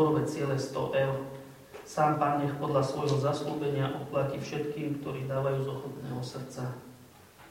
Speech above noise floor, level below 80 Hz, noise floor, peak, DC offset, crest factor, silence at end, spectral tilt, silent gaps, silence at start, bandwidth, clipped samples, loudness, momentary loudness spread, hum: 23 dB; -64 dBFS; -54 dBFS; -12 dBFS; under 0.1%; 18 dB; 0 s; -6.5 dB/octave; none; 0 s; 16.5 kHz; under 0.1%; -31 LUFS; 11 LU; none